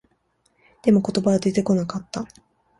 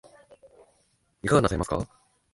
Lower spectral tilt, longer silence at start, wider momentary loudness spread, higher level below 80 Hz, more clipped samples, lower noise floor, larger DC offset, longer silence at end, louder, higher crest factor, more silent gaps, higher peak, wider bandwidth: about the same, -7 dB/octave vs -6 dB/octave; second, 0.85 s vs 1.25 s; about the same, 14 LU vs 13 LU; second, -56 dBFS vs -46 dBFS; neither; about the same, -67 dBFS vs -69 dBFS; neither; about the same, 0.55 s vs 0.5 s; first, -22 LUFS vs -26 LUFS; about the same, 18 dB vs 22 dB; neither; about the same, -6 dBFS vs -6 dBFS; about the same, 11.5 kHz vs 11.5 kHz